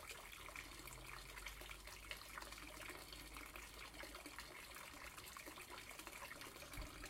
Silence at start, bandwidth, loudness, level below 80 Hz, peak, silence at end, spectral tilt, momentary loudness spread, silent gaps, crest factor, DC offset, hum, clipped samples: 0 s; 16.5 kHz; -53 LUFS; -64 dBFS; -32 dBFS; 0 s; -2 dB/octave; 2 LU; none; 24 dB; under 0.1%; none; under 0.1%